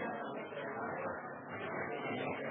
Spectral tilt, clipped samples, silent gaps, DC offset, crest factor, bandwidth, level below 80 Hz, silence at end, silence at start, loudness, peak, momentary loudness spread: -1 dB/octave; under 0.1%; none; under 0.1%; 14 dB; 3.7 kHz; -80 dBFS; 0 s; 0 s; -41 LUFS; -28 dBFS; 5 LU